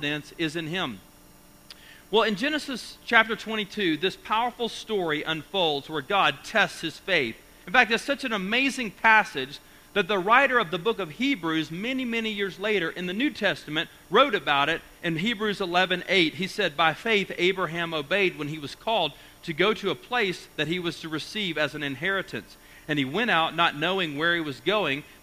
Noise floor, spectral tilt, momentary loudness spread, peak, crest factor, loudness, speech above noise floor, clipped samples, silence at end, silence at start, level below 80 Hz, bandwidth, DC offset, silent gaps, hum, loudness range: -52 dBFS; -4 dB/octave; 10 LU; -2 dBFS; 24 dB; -25 LUFS; 27 dB; under 0.1%; 0.15 s; 0 s; -58 dBFS; 15.5 kHz; under 0.1%; none; none; 4 LU